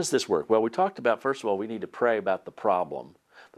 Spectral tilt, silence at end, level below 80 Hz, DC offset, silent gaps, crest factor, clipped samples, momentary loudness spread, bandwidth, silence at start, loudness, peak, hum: -4 dB/octave; 0.15 s; -74 dBFS; under 0.1%; none; 18 dB; under 0.1%; 7 LU; 14 kHz; 0 s; -27 LUFS; -10 dBFS; none